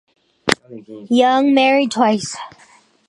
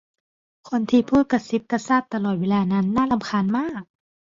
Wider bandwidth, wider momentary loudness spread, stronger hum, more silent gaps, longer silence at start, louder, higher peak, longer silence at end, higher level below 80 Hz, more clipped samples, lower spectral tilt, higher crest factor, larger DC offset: first, 11.5 kHz vs 7.6 kHz; first, 21 LU vs 7 LU; neither; neither; second, 0.45 s vs 0.65 s; first, -16 LUFS vs -22 LUFS; first, 0 dBFS vs -6 dBFS; about the same, 0.6 s vs 0.5 s; about the same, -58 dBFS vs -54 dBFS; neither; second, -4 dB/octave vs -7 dB/octave; about the same, 18 dB vs 16 dB; neither